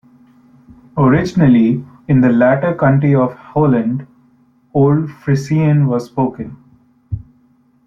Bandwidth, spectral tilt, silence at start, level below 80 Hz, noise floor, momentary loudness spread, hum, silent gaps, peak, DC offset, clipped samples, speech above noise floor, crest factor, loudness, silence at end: 7.2 kHz; -9 dB/octave; 0.95 s; -44 dBFS; -53 dBFS; 15 LU; none; none; -2 dBFS; under 0.1%; under 0.1%; 41 dB; 14 dB; -14 LUFS; 0.65 s